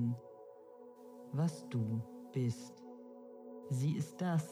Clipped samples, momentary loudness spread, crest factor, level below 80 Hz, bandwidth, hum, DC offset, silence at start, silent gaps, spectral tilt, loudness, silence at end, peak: under 0.1%; 19 LU; 14 dB; -86 dBFS; 14.5 kHz; none; under 0.1%; 0 s; none; -7.5 dB/octave; -39 LUFS; 0 s; -26 dBFS